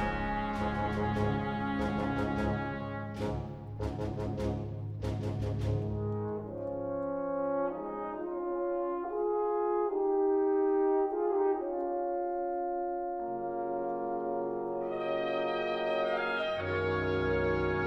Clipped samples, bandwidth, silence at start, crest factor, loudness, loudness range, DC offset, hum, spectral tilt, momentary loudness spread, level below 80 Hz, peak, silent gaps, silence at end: under 0.1%; 9.6 kHz; 0 s; 12 dB; -33 LUFS; 5 LU; under 0.1%; none; -8 dB/octave; 7 LU; -48 dBFS; -20 dBFS; none; 0 s